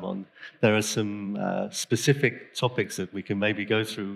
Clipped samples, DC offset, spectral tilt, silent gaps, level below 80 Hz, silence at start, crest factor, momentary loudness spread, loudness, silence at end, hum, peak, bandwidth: under 0.1%; under 0.1%; -4.5 dB/octave; none; -78 dBFS; 0 s; 20 dB; 9 LU; -27 LUFS; 0 s; none; -8 dBFS; 15.5 kHz